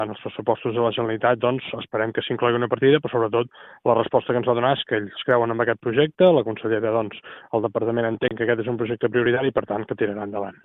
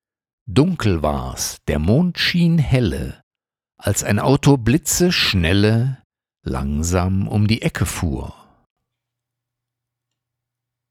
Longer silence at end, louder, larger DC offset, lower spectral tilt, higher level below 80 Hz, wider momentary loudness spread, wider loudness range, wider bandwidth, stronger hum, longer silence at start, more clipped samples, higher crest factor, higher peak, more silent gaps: second, 0.15 s vs 2.6 s; second, -22 LUFS vs -18 LUFS; neither; first, -10 dB/octave vs -5 dB/octave; second, -62 dBFS vs -34 dBFS; about the same, 9 LU vs 11 LU; second, 3 LU vs 7 LU; second, 4 kHz vs 16.5 kHz; neither; second, 0 s vs 0.45 s; neither; about the same, 18 dB vs 18 dB; about the same, -4 dBFS vs -2 dBFS; second, none vs 3.23-3.31 s, 6.04-6.10 s